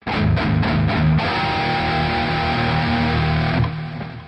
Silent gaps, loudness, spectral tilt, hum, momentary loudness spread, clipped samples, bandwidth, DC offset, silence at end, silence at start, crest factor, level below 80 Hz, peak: none; -19 LUFS; -7.5 dB/octave; none; 3 LU; under 0.1%; 8.4 kHz; under 0.1%; 0 s; 0.05 s; 12 dB; -34 dBFS; -8 dBFS